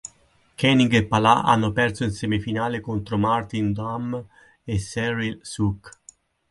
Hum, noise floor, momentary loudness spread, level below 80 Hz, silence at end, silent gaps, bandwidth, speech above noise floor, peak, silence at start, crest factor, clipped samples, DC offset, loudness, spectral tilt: none; -59 dBFS; 12 LU; -46 dBFS; 0.6 s; none; 11.5 kHz; 37 dB; -2 dBFS; 0.05 s; 22 dB; under 0.1%; under 0.1%; -22 LUFS; -5.5 dB/octave